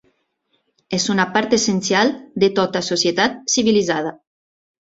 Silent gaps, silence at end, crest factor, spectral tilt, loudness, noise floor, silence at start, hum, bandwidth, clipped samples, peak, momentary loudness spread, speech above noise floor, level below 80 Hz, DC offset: none; 0.7 s; 18 dB; -3.5 dB/octave; -18 LUFS; -68 dBFS; 0.9 s; none; 8 kHz; under 0.1%; -2 dBFS; 5 LU; 50 dB; -58 dBFS; under 0.1%